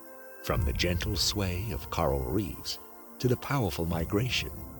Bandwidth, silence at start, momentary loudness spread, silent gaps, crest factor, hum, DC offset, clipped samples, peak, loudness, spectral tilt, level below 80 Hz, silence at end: 19.5 kHz; 0 s; 9 LU; none; 18 dB; none; under 0.1%; under 0.1%; -12 dBFS; -30 LUFS; -5 dB/octave; -40 dBFS; 0 s